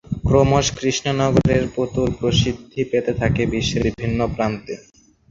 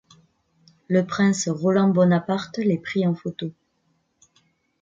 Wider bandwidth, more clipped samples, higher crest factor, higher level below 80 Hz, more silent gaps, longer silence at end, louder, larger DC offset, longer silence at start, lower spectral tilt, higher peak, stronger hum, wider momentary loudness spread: about the same, 7.8 kHz vs 7.8 kHz; neither; about the same, 18 dB vs 16 dB; first, -34 dBFS vs -66 dBFS; neither; second, 0.5 s vs 1.3 s; first, -19 LUFS vs -22 LUFS; neither; second, 0.1 s vs 0.9 s; about the same, -5.5 dB/octave vs -6 dB/octave; first, -2 dBFS vs -6 dBFS; neither; second, 7 LU vs 11 LU